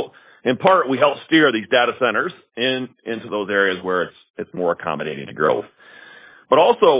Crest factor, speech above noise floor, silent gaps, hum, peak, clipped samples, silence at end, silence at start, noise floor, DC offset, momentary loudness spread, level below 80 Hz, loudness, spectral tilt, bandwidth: 18 dB; 26 dB; 4.30-4.34 s; none; -2 dBFS; under 0.1%; 0 s; 0 s; -44 dBFS; under 0.1%; 13 LU; -62 dBFS; -19 LUFS; -8.5 dB/octave; 4 kHz